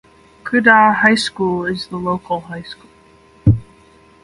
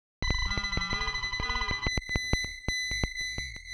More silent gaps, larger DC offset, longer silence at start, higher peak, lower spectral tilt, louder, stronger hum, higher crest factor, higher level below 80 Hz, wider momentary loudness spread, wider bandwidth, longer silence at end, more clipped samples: neither; neither; first, 0.45 s vs 0.2 s; first, 0 dBFS vs -10 dBFS; first, -6 dB/octave vs -2.5 dB/octave; first, -15 LUFS vs -31 LUFS; neither; about the same, 18 dB vs 22 dB; about the same, -38 dBFS vs -38 dBFS; first, 21 LU vs 3 LU; about the same, 11.5 kHz vs 12.5 kHz; first, 0.6 s vs 0 s; neither